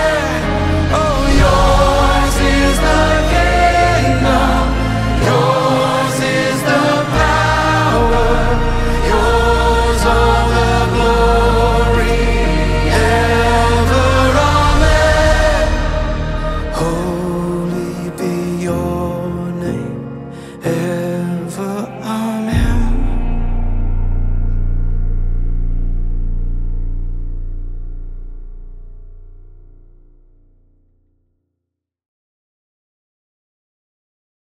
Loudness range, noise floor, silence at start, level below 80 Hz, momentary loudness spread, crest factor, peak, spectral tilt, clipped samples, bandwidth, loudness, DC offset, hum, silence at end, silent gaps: 11 LU; -79 dBFS; 0 s; -18 dBFS; 12 LU; 14 dB; 0 dBFS; -5.5 dB/octave; under 0.1%; 14.5 kHz; -15 LUFS; under 0.1%; none; 4.85 s; none